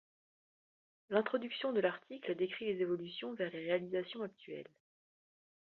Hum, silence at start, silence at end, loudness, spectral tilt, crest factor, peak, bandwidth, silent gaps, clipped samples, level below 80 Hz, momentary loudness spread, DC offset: none; 1.1 s; 1.05 s; -38 LUFS; -3.5 dB/octave; 24 dB; -16 dBFS; 4.5 kHz; none; under 0.1%; -84 dBFS; 11 LU; under 0.1%